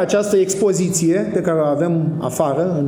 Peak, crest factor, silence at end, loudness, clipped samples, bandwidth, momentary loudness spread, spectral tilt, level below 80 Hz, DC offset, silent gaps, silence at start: -2 dBFS; 14 dB; 0 s; -17 LUFS; under 0.1%; over 20 kHz; 4 LU; -6 dB/octave; -56 dBFS; under 0.1%; none; 0 s